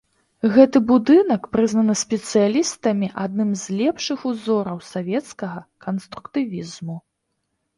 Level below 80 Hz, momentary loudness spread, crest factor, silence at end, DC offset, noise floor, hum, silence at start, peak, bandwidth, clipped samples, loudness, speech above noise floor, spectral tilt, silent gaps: -60 dBFS; 17 LU; 20 dB; 0.8 s; under 0.1%; -75 dBFS; none; 0.45 s; 0 dBFS; 11.5 kHz; under 0.1%; -20 LUFS; 55 dB; -5.5 dB/octave; none